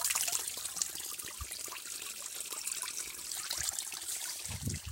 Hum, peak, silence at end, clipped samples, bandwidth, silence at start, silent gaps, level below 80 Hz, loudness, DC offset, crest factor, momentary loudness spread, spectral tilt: none; -12 dBFS; 0 s; under 0.1%; 17 kHz; 0 s; none; -60 dBFS; -36 LUFS; under 0.1%; 28 dB; 7 LU; -0.5 dB/octave